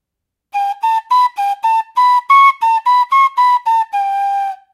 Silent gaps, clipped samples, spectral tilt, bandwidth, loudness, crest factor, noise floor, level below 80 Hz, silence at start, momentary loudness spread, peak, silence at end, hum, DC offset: none; under 0.1%; 3.5 dB/octave; 14.5 kHz; -13 LUFS; 14 dB; -79 dBFS; -80 dBFS; 0.55 s; 9 LU; 0 dBFS; 0.2 s; none; under 0.1%